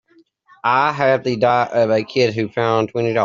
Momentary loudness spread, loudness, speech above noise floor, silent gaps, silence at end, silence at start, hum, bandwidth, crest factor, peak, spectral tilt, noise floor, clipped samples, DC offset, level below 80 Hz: 3 LU; -17 LUFS; 36 dB; none; 0 s; 0.65 s; none; 7.4 kHz; 16 dB; -2 dBFS; -4 dB/octave; -53 dBFS; under 0.1%; under 0.1%; -60 dBFS